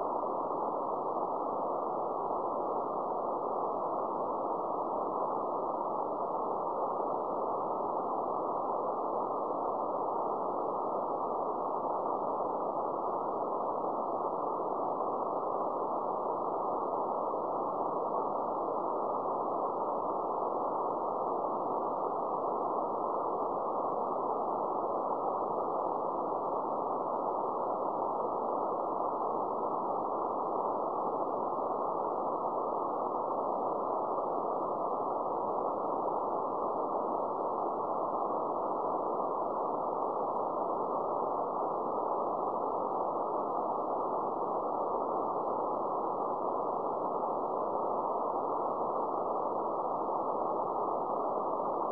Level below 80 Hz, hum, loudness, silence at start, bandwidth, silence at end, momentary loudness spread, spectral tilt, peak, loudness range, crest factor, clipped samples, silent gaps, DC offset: -74 dBFS; none; -34 LUFS; 0 s; 5.4 kHz; 0 s; 1 LU; -9 dB/octave; -20 dBFS; 1 LU; 14 dB; under 0.1%; none; 0.1%